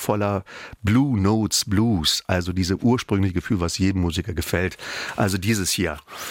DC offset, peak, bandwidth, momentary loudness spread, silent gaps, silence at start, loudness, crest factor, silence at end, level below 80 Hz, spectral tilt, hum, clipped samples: under 0.1%; -6 dBFS; 17 kHz; 8 LU; none; 0 s; -22 LUFS; 16 dB; 0 s; -46 dBFS; -4.5 dB/octave; none; under 0.1%